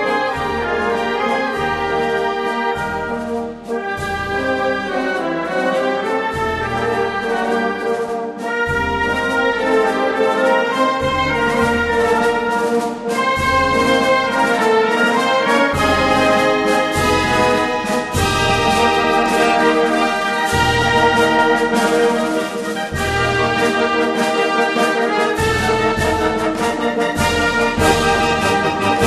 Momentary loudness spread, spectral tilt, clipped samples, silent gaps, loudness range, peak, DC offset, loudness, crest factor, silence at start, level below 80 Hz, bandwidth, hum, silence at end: 6 LU; -4.5 dB/octave; under 0.1%; none; 5 LU; 0 dBFS; under 0.1%; -16 LUFS; 16 dB; 0 s; -36 dBFS; 13 kHz; none; 0 s